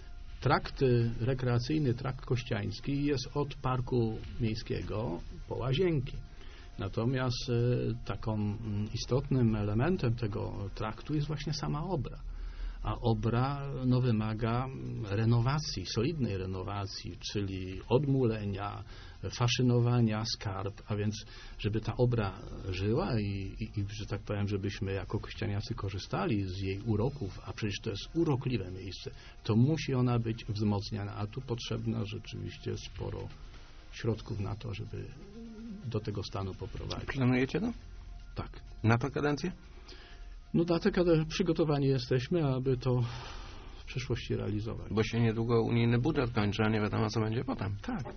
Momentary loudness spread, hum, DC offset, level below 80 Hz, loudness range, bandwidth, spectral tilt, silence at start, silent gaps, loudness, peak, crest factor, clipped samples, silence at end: 14 LU; none; under 0.1%; -46 dBFS; 5 LU; 6.6 kHz; -6.5 dB/octave; 0 s; none; -33 LUFS; -12 dBFS; 20 dB; under 0.1%; 0 s